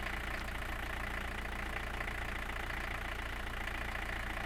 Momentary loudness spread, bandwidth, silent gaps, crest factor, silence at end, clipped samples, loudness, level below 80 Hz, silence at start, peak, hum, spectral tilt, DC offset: 1 LU; 17 kHz; none; 14 dB; 0 s; under 0.1%; -40 LUFS; -44 dBFS; 0 s; -24 dBFS; none; -4 dB/octave; under 0.1%